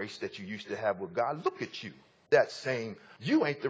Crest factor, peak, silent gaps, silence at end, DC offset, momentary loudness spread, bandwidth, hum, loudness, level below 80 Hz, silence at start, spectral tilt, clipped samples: 22 dB; -10 dBFS; none; 0 s; under 0.1%; 14 LU; 8 kHz; none; -32 LUFS; -74 dBFS; 0 s; -5.5 dB/octave; under 0.1%